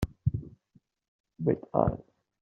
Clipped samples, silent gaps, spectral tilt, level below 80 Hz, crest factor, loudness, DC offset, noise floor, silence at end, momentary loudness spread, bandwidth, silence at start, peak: under 0.1%; 1.08-1.24 s; -9.5 dB/octave; -48 dBFS; 26 dB; -31 LUFS; under 0.1%; -67 dBFS; 0.4 s; 15 LU; 7.4 kHz; 0 s; -8 dBFS